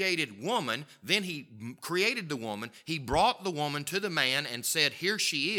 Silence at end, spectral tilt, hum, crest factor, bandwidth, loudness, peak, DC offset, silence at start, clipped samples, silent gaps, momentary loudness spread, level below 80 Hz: 0 s; -2.5 dB/octave; none; 22 dB; 18.5 kHz; -30 LUFS; -8 dBFS; under 0.1%; 0 s; under 0.1%; none; 11 LU; -58 dBFS